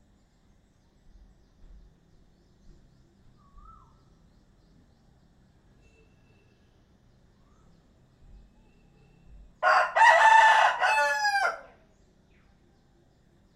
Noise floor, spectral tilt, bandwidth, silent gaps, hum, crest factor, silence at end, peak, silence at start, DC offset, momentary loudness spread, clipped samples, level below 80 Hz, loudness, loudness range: -63 dBFS; -0.5 dB/octave; 13.5 kHz; none; none; 24 dB; 1.95 s; -6 dBFS; 9.6 s; under 0.1%; 11 LU; under 0.1%; -60 dBFS; -21 LUFS; 6 LU